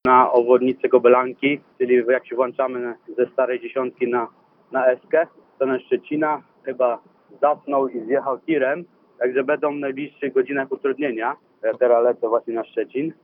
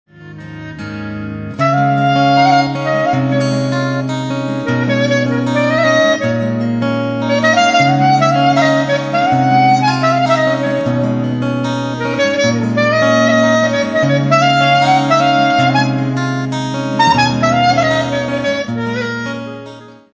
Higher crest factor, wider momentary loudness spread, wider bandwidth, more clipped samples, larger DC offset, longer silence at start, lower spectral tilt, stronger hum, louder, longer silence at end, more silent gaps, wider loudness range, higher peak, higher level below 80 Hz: first, 20 dB vs 14 dB; about the same, 10 LU vs 9 LU; second, 3.7 kHz vs 8 kHz; neither; neither; second, 0.05 s vs 0.2 s; first, -9.5 dB/octave vs -5.5 dB/octave; neither; second, -21 LUFS vs -13 LUFS; second, 0.1 s vs 0.25 s; neither; about the same, 4 LU vs 3 LU; about the same, 0 dBFS vs 0 dBFS; second, -68 dBFS vs -48 dBFS